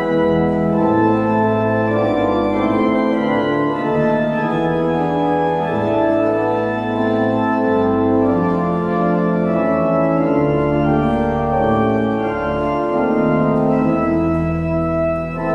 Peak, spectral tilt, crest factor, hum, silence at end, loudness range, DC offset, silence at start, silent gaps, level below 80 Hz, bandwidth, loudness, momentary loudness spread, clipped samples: -4 dBFS; -9 dB/octave; 12 dB; none; 0 s; 1 LU; under 0.1%; 0 s; none; -40 dBFS; 7.4 kHz; -17 LUFS; 3 LU; under 0.1%